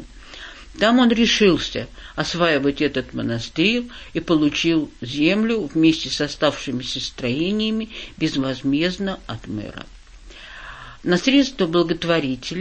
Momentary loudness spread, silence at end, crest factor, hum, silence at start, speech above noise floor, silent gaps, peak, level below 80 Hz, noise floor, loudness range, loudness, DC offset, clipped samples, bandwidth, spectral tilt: 19 LU; 0 s; 18 dB; none; 0 s; 21 dB; none; -4 dBFS; -44 dBFS; -41 dBFS; 5 LU; -20 LUFS; under 0.1%; under 0.1%; 8.6 kHz; -5 dB/octave